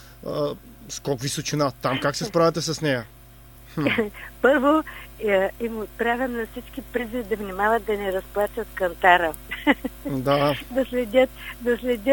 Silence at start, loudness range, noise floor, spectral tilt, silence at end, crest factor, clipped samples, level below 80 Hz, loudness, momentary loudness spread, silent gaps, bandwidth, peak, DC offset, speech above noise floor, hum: 0 s; 3 LU; -47 dBFS; -4.5 dB/octave; 0 s; 22 dB; under 0.1%; -46 dBFS; -24 LUFS; 11 LU; none; 19.5 kHz; -2 dBFS; under 0.1%; 23 dB; none